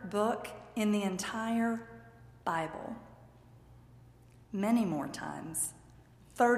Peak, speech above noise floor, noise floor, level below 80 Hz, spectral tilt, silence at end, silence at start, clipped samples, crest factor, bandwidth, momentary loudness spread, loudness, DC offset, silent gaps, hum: -16 dBFS; 25 dB; -58 dBFS; -64 dBFS; -4.5 dB/octave; 0 s; 0 s; under 0.1%; 20 dB; 15.5 kHz; 14 LU; -34 LUFS; under 0.1%; none; none